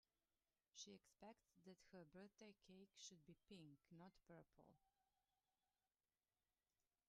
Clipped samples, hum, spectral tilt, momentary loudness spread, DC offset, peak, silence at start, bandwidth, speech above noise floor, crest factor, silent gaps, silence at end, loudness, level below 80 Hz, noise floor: under 0.1%; none; -3.5 dB/octave; 7 LU; under 0.1%; -46 dBFS; 0.75 s; 9.6 kHz; over 23 dB; 22 dB; none; 2.2 s; -66 LUFS; under -90 dBFS; under -90 dBFS